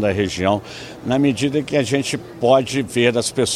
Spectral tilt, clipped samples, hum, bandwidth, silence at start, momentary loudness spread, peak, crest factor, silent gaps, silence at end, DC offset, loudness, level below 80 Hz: -4.5 dB/octave; under 0.1%; none; 14.5 kHz; 0 s; 7 LU; -2 dBFS; 18 dB; none; 0 s; under 0.1%; -19 LUFS; -50 dBFS